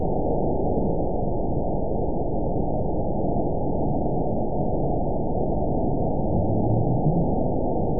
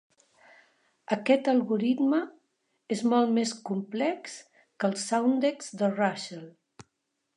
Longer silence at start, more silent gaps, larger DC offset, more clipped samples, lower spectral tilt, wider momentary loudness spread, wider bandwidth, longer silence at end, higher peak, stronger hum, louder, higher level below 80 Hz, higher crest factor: second, 0 s vs 1.1 s; neither; first, 4% vs under 0.1%; neither; first, -19 dB/octave vs -5 dB/octave; second, 4 LU vs 14 LU; second, 1 kHz vs 11 kHz; second, 0 s vs 0.85 s; about the same, -10 dBFS vs -8 dBFS; neither; first, -25 LUFS vs -28 LUFS; first, -30 dBFS vs -82 dBFS; second, 12 dB vs 20 dB